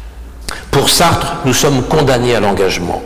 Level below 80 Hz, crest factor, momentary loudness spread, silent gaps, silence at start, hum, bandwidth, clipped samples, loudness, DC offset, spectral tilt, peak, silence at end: -30 dBFS; 10 dB; 12 LU; none; 0 s; none; 19 kHz; under 0.1%; -12 LUFS; 4%; -4 dB/octave; -4 dBFS; 0 s